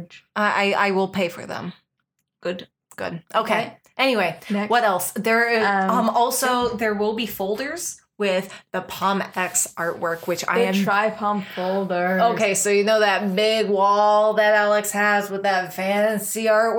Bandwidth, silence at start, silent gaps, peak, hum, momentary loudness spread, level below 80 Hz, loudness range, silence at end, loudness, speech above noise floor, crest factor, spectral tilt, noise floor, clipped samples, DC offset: over 20 kHz; 0 s; none; -6 dBFS; none; 13 LU; -64 dBFS; 6 LU; 0 s; -21 LUFS; 55 dB; 16 dB; -3.5 dB/octave; -76 dBFS; under 0.1%; under 0.1%